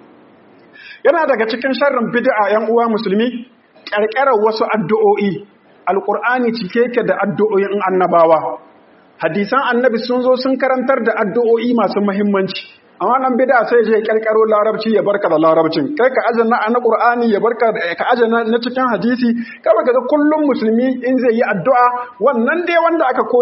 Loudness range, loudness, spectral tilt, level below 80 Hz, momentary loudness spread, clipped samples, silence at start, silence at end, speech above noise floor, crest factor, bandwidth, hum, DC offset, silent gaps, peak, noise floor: 2 LU; -15 LUFS; -4 dB/octave; -66 dBFS; 5 LU; under 0.1%; 0.8 s; 0 s; 33 dB; 14 dB; 5.8 kHz; none; under 0.1%; none; 0 dBFS; -47 dBFS